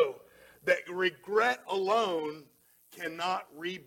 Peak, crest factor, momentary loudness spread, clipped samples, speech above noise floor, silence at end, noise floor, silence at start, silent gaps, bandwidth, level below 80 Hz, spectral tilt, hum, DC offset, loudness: -14 dBFS; 18 dB; 12 LU; under 0.1%; 25 dB; 0.05 s; -57 dBFS; 0 s; none; 17.5 kHz; -78 dBFS; -3.5 dB/octave; none; under 0.1%; -31 LUFS